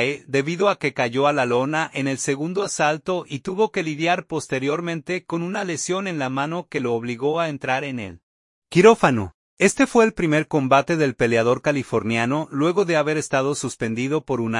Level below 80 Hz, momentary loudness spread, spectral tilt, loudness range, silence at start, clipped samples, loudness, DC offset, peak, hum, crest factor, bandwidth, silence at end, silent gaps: -56 dBFS; 8 LU; -5 dB/octave; 6 LU; 0 s; under 0.1%; -21 LUFS; under 0.1%; -2 dBFS; none; 20 dB; 11.5 kHz; 0 s; 8.23-8.62 s, 9.34-9.57 s